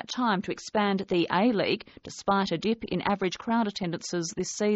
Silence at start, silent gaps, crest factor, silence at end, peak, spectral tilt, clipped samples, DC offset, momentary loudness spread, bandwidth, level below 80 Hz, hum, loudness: 0.1 s; none; 18 dB; 0 s; -10 dBFS; -4 dB/octave; under 0.1%; under 0.1%; 7 LU; 8 kHz; -60 dBFS; none; -28 LUFS